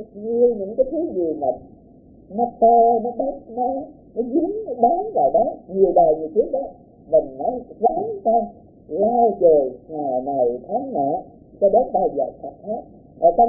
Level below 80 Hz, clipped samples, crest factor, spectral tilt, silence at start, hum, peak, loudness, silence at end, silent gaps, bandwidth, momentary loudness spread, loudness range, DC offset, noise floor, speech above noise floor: -52 dBFS; under 0.1%; 16 dB; -16.5 dB/octave; 0 s; none; -4 dBFS; -20 LUFS; 0 s; none; 0.9 kHz; 13 LU; 2 LU; under 0.1%; -48 dBFS; 28 dB